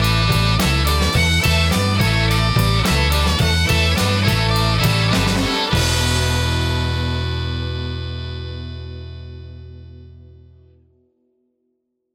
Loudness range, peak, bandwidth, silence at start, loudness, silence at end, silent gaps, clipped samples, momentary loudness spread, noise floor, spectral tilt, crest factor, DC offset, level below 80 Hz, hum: 16 LU; -6 dBFS; 17.5 kHz; 0 s; -17 LUFS; 1.95 s; none; under 0.1%; 16 LU; -71 dBFS; -4.5 dB/octave; 12 dB; under 0.1%; -26 dBFS; none